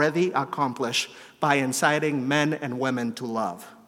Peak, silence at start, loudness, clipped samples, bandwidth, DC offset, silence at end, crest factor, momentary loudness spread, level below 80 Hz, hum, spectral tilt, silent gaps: -6 dBFS; 0 s; -25 LUFS; under 0.1%; 16.5 kHz; under 0.1%; 0.15 s; 20 dB; 7 LU; -76 dBFS; none; -4 dB/octave; none